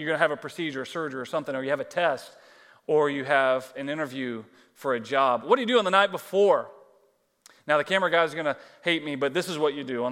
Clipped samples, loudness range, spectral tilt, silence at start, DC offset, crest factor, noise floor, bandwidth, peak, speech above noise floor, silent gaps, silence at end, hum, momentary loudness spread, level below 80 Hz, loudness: under 0.1%; 3 LU; -4.5 dB/octave; 0 s; under 0.1%; 20 dB; -66 dBFS; 16 kHz; -6 dBFS; 40 dB; none; 0 s; none; 11 LU; -82 dBFS; -26 LUFS